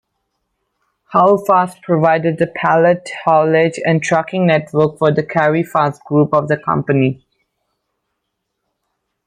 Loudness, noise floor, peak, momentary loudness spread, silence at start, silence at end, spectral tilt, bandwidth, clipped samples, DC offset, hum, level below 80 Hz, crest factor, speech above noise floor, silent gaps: -15 LUFS; -74 dBFS; 0 dBFS; 5 LU; 1.1 s; 2.1 s; -7 dB/octave; 15 kHz; under 0.1%; under 0.1%; none; -58 dBFS; 16 dB; 60 dB; none